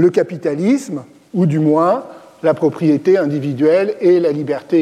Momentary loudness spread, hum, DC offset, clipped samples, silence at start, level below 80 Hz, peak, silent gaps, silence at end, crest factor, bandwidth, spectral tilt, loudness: 7 LU; none; under 0.1%; under 0.1%; 0 s; -66 dBFS; -2 dBFS; none; 0 s; 12 dB; 10.5 kHz; -8 dB/octave; -16 LUFS